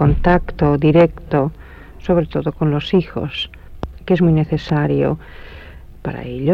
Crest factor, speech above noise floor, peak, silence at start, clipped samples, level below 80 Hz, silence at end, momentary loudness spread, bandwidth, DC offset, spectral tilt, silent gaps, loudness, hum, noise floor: 16 dB; 20 dB; -2 dBFS; 0 s; under 0.1%; -30 dBFS; 0 s; 18 LU; 6.6 kHz; under 0.1%; -9 dB/octave; none; -17 LUFS; none; -36 dBFS